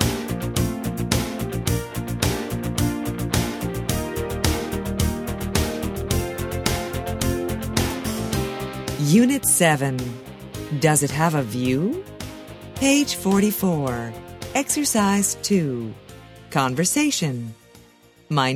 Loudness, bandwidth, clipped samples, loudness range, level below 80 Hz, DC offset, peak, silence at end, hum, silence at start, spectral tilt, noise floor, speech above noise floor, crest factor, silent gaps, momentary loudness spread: -22 LUFS; 16 kHz; under 0.1%; 5 LU; -36 dBFS; under 0.1%; -2 dBFS; 0 s; none; 0 s; -4.5 dB/octave; -52 dBFS; 32 dB; 20 dB; none; 11 LU